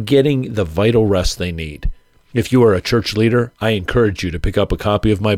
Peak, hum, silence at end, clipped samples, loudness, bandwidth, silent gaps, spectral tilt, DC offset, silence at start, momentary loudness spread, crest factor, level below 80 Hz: -2 dBFS; none; 0 s; under 0.1%; -17 LUFS; 15.5 kHz; none; -6.5 dB/octave; under 0.1%; 0 s; 10 LU; 12 dB; -28 dBFS